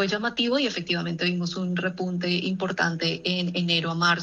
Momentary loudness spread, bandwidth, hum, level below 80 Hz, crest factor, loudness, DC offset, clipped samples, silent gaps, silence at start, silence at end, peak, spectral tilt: 4 LU; 7.8 kHz; none; -64 dBFS; 16 dB; -25 LUFS; under 0.1%; under 0.1%; none; 0 s; 0 s; -10 dBFS; -5 dB/octave